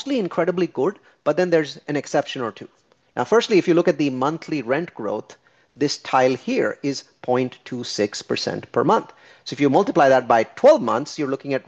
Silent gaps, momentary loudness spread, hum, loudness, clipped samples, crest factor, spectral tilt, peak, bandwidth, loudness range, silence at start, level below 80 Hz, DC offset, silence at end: none; 12 LU; none; -21 LUFS; under 0.1%; 18 dB; -5.5 dB/octave; -2 dBFS; 8.4 kHz; 5 LU; 0 s; -66 dBFS; under 0.1%; 0.05 s